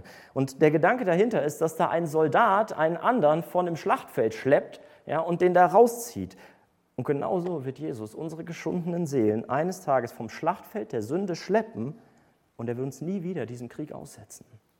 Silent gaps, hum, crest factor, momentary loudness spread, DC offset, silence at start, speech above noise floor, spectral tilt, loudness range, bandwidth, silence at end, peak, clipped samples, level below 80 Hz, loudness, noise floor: none; none; 20 dB; 16 LU; under 0.1%; 0.05 s; 37 dB; -6.5 dB/octave; 8 LU; 17.5 kHz; 0.45 s; -6 dBFS; under 0.1%; -70 dBFS; -26 LUFS; -63 dBFS